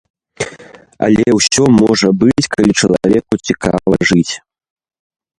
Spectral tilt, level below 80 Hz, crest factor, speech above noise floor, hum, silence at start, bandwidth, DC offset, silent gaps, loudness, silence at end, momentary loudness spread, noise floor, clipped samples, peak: -4.5 dB/octave; -40 dBFS; 14 dB; 27 dB; none; 0.4 s; 11.5 kHz; under 0.1%; none; -12 LUFS; 1 s; 14 LU; -38 dBFS; under 0.1%; 0 dBFS